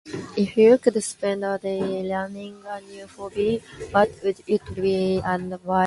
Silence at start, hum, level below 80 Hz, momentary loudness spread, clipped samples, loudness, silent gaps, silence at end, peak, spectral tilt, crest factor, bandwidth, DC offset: 0.05 s; none; -52 dBFS; 18 LU; under 0.1%; -23 LUFS; none; 0 s; -4 dBFS; -5.5 dB/octave; 18 dB; 11.5 kHz; under 0.1%